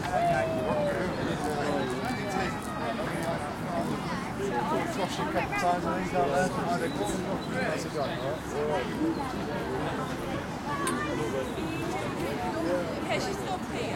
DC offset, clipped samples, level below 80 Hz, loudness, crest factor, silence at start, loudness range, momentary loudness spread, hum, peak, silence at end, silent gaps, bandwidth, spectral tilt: under 0.1%; under 0.1%; -50 dBFS; -30 LUFS; 16 dB; 0 s; 2 LU; 5 LU; none; -14 dBFS; 0 s; none; 16.5 kHz; -5.5 dB/octave